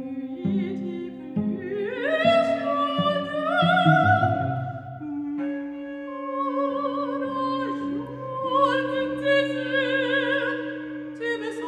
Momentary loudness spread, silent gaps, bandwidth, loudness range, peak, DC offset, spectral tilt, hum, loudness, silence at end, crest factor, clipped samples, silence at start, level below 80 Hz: 13 LU; none; 10 kHz; 7 LU; -6 dBFS; under 0.1%; -7 dB/octave; none; -25 LUFS; 0 s; 20 dB; under 0.1%; 0 s; -64 dBFS